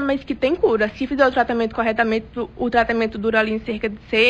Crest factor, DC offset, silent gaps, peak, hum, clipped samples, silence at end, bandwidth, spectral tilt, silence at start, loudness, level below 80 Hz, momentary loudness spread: 16 dB; under 0.1%; none; -4 dBFS; none; under 0.1%; 0 s; 8.6 kHz; -6 dB/octave; 0 s; -20 LUFS; -44 dBFS; 7 LU